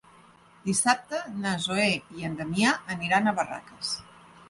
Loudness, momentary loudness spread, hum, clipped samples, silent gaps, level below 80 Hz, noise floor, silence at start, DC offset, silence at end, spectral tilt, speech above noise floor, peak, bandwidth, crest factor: -27 LUFS; 10 LU; none; under 0.1%; none; -62 dBFS; -55 dBFS; 0.65 s; under 0.1%; 0.05 s; -3.5 dB/octave; 28 dB; -8 dBFS; 11.5 kHz; 20 dB